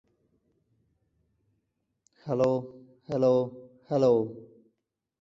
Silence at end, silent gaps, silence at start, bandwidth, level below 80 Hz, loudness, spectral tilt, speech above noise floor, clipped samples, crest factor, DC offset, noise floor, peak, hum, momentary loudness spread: 0.75 s; none; 2.25 s; 7.4 kHz; -68 dBFS; -27 LUFS; -8.5 dB/octave; 55 dB; under 0.1%; 20 dB; under 0.1%; -80 dBFS; -12 dBFS; none; 20 LU